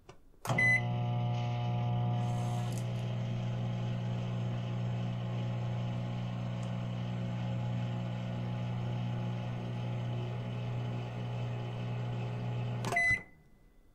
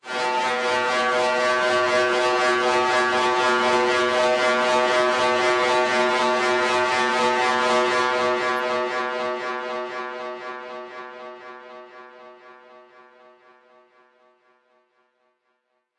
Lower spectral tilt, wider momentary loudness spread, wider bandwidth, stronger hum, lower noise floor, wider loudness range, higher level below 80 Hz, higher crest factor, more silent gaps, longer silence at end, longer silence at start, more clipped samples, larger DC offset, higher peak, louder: first, -6.5 dB/octave vs -2.5 dB/octave; second, 8 LU vs 16 LU; second, 10.5 kHz vs 12 kHz; neither; second, -60 dBFS vs -72 dBFS; second, 5 LU vs 15 LU; first, -58 dBFS vs -70 dBFS; about the same, 16 dB vs 14 dB; neither; second, 0.15 s vs 3.45 s; about the same, 0.1 s vs 0.05 s; neither; neither; second, -18 dBFS vs -8 dBFS; second, -35 LUFS vs -20 LUFS